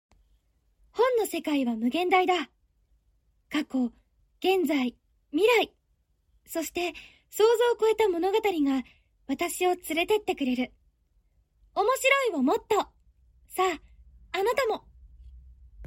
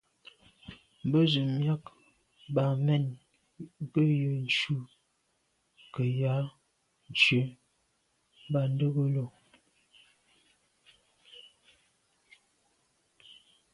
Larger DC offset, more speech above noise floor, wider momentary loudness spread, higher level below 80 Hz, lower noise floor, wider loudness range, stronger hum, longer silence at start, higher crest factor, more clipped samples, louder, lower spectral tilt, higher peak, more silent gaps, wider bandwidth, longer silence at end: neither; about the same, 45 dB vs 47 dB; second, 13 LU vs 26 LU; first, -60 dBFS vs -70 dBFS; second, -71 dBFS vs -75 dBFS; about the same, 3 LU vs 5 LU; neither; first, 0.95 s vs 0.7 s; about the same, 20 dB vs 24 dB; neither; about the same, -27 LUFS vs -29 LUFS; second, -3 dB/octave vs -6.5 dB/octave; about the same, -10 dBFS vs -8 dBFS; neither; first, 16.5 kHz vs 11 kHz; second, 0 s vs 0.4 s